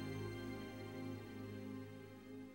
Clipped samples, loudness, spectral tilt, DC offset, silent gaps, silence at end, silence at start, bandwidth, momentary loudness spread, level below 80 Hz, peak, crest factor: under 0.1%; -50 LUFS; -6.5 dB/octave; under 0.1%; none; 0 s; 0 s; 16 kHz; 8 LU; -68 dBFS; -36 dBFS; 14 dB